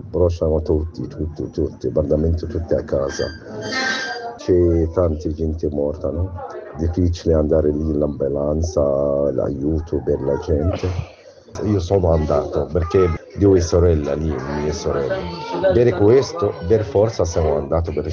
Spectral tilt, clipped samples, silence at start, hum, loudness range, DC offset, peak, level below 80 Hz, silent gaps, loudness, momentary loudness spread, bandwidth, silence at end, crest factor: -7 dB/octave; under 0.1%; 0 s; none; 3 LU; under 0.1%; -4 dBFS; -32 dBFS; none; -20 LUFS; 10 LU; 7.2 kHz; 0 s; 16 dB